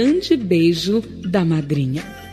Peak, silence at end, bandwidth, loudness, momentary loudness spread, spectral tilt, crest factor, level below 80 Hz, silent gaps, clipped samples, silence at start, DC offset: -4 dBFS; 0 s; 13.5 kHz; -19 LUFS; 6 LU; -6.5 dB/octave; 14 dB; -46 dBFS; none; under 0.1%; 0 s; under 0.1%